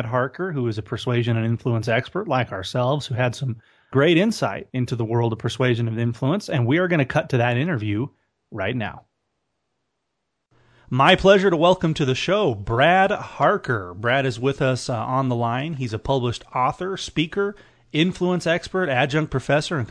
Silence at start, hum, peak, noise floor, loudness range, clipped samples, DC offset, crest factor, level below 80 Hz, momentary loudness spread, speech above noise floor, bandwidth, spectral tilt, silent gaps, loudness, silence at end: 0 s; none; -2 dBFS; -78 dBFS; 6 LU; under 0.1%; under 0.1%; 18 dB; -50 dBFS; 9 LU; 56 dB; 11 kHz; -6 dB/octave; none; -21 LUFS; 0 s